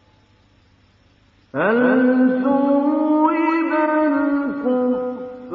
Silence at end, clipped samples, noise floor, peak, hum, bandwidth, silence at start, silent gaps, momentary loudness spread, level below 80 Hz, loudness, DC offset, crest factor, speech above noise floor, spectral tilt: 0 s; under 0.1%; -55 dBFS; -4 dBFS; none; 4.8 kHz; 1.55 s; none; 7 LU; -62 dBFS; -18 LUFS; under 0.1%; 14 dB; 39 dB; -9 dB/octave